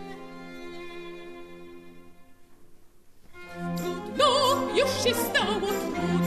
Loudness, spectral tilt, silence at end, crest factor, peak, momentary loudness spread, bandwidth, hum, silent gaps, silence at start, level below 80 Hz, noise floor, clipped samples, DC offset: -25 LUFS; -4 dB/octave; 0 s; 20 dB; -8 dBFS; 22 LU; 14 kHz; none; none; 0 s; -56 dBFS; -51 dBFS; under 0.1%; 0.2%